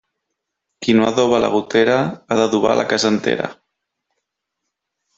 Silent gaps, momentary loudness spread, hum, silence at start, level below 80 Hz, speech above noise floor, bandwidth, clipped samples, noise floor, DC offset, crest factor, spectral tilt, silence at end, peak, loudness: none; 6 LU; none; 0.8 s; -56 dBFS; 62 dB; 8 kHz; under 0.1%; -78 dBFS; under 0.1%; 18 dB; -4.5 dB/octave; 1.65 s; -2 dBFS; -17 LUFS